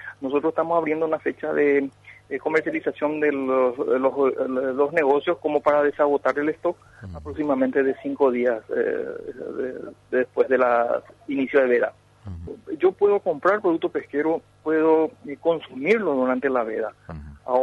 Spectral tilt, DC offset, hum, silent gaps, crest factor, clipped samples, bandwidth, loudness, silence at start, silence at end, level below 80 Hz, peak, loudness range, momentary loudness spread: -7.5 dB/octave; under 0.1%; none; none; 16 dB; under 0.1%; 7 kHz; -23 LUFS; 0 s; 0 s; -56 dBFS; -8 dBFS; 2 LU; 13 LU